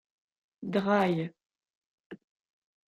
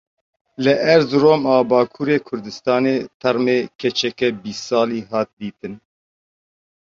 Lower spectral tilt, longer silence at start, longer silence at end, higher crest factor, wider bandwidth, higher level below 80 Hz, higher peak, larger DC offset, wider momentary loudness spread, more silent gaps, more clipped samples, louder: first, -7.5 dB/octave vs -5.5 dB/octave; about the same, 0.6 s vs 0.6 s; second, 0.75 s vs 1.05 s; about the same, 20 dB vs 18 dB; first, 11 kHz vs 7.6 kHz; second, -74 dBFS vs -60 dBFS; second, -14 dBFS vs -2 dBFS; neither; about the same, 15 LU vs 14 LU; first, 1.75-2.10 s vs 3.14-3.20 s, 3.75-3.79 s, 5.33-5.37 s; neither; second, -29 LUFS vs -18 LUFS